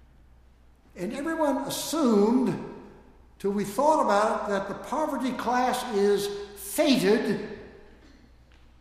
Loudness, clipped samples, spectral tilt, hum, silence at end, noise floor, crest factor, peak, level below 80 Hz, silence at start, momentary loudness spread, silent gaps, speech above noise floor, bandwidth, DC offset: -26 LUFS; under 0.1%; -4.5 dB/octave; none; 1.1 s; -56 dBFS; 18 dB; -8 dBFS; -56 dBFS; 0.95 s; 13 LU; none; 31 dB; 15.5 kHz; under 0.1%